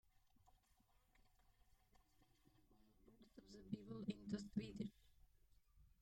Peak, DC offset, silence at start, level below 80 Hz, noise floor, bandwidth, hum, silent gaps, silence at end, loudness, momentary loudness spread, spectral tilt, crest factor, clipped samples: -34 dBFS; under 0.1%; 0.4 s; -74 dBFS; -78 dBFS; 16 kHz; none; none; 0.15 s; -51 LUFS; 16 LU; -7 dB/octave; 22 dB; under 0.1%